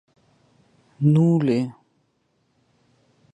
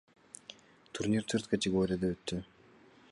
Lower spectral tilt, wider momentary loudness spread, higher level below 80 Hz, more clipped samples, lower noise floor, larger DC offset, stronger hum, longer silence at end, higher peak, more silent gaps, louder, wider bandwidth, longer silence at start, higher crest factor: first, -9.5 dB/octave vs -5.5 dB/octave; second, 9 LU vs 19 LU; second, -68 dBFS vs -60 dBFS; neither; first, -68 dBFS vs -61 dBFS; neither; neither; first, 1.65 s vs 0.65 s; first, -8 dBFS vs -16 dBFS; neither; first, -20 LUFS vs -33 LUFS; second, 8.6 kHz vs 11.5 kHz; first, 1 s vs 0.5 s; about the same, 18 dB vs 20 dB